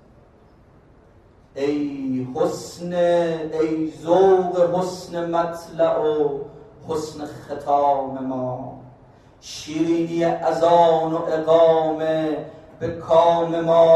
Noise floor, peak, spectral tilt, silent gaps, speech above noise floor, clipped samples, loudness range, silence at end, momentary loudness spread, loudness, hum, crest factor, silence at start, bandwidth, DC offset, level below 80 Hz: -51 dBFS; -4 dBFS; -6.5 dB/octave; none; 32 dB; under 0.1%; 6 LU; 0 s; 16 LU; -20 LUFS; none; 18 dB; 1.55 s; 12.5 kHz; under 0.1%; -56 dBFS